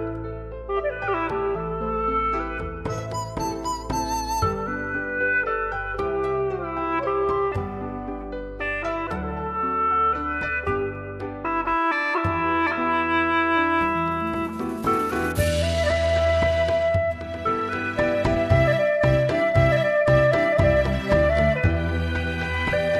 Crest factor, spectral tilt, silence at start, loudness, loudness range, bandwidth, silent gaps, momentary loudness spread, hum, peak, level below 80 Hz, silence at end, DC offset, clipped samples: 16 dB; -6 dB/octave; 0 s; -23 LUFS; 7 LU; 13.5 kHz; none; 10 LU; none; -6 dBFS; -36 dBFS; 0 s; under 0.1%; under 0.1%